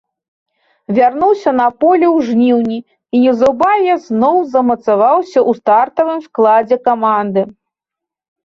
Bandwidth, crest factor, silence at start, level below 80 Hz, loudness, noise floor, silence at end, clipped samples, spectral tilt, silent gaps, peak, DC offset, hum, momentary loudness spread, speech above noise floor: 7.2 kHz; 12 dB; 0.9 s; -56 dBFS; -12 LUFS; -83 dBFS; 0.95 s; under 0.1%; -7 dB/octave; none; 0 dBFS; under 0.1%; none; 6 LU; 72 dB